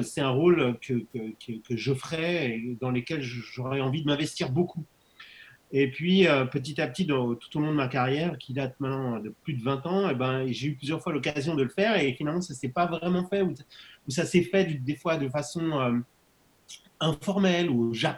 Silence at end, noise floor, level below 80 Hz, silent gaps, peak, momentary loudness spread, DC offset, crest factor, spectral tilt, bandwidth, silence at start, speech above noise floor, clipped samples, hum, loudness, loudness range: 0 s; -64 dBFS; -62 dBFS; none; -8 dBFS; 11 LU; under 0.1%; 20 dB; -6 dB/octave; 12.5 kHz; 0 s; 36 dB; under 0.1%; none; -28 LUFS; 3 LU